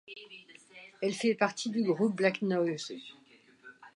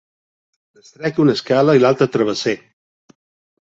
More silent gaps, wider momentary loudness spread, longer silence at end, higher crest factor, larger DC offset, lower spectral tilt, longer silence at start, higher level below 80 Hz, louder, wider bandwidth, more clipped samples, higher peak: neither; first, 22 LU vs 10 LU; second, 0.1 s vs 1.2 s; about the same, 20 dB vs 16 dB; neither; about the same, -5 dB/octave vs -6 dB/octave; second, 0.1 s vs 1 s; second, -84 dBFS vs -60 dBFS; second, -31 LUFS vs -16 LUFS; first, 11.5 kHz vs 8 kHz; neither; second, -12 dBFS vs -2 dBFS